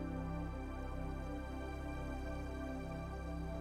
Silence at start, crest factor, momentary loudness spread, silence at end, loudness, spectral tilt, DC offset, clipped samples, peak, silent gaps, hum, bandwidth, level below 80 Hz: 0 s; 12 dB; 2 LU; 0 s; -45 LUFS; -7.5 dB/octave; under 0.1%; under 0.1%; -30 dBFS; none; none; 14 kHz; -46 dBFS